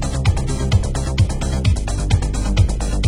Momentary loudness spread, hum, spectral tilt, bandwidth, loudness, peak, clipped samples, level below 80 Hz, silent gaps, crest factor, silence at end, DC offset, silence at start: 2 LU; none; -5.5 dB/octave; 11.5 kHz; -19 LUFS; -2 dBFS; under 0.1%; -20 dBFS; none; 14 dB; 0 s; under 0.1%; 0 s